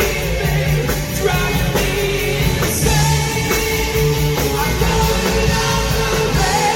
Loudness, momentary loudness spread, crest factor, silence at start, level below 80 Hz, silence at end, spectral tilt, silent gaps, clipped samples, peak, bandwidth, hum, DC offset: -16 LUFS; 3 LU; 14 dB; 0 s; -24 dBFS; 0 s; -4 dB/octave; none; under 0.1%; -2 dBFS; 17 kHz; none; under 0.1%